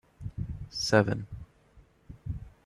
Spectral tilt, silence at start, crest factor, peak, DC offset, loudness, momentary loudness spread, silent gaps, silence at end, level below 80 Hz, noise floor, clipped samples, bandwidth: -5 dB/octave; 0.2 s; 24 dB; -10 dBFS; under 0.1%; -30 LUFS; 20 LU; none; 0.15 s; -48 dBFS; -60 dBFS; under 0.1%; 13 kHz